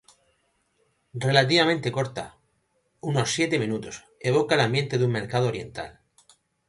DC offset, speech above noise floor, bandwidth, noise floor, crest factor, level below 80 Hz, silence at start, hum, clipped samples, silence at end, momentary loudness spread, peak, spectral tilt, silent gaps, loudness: under 0.1%; 47 dB; 11.5 kHz; -71 dBFS; 24 dB; -60 dBFS; 1.15 s; none; under 0.1%; 0.8 s; 17 LU; -2 dBFS; -5 dB/octave; none; -24 LUFS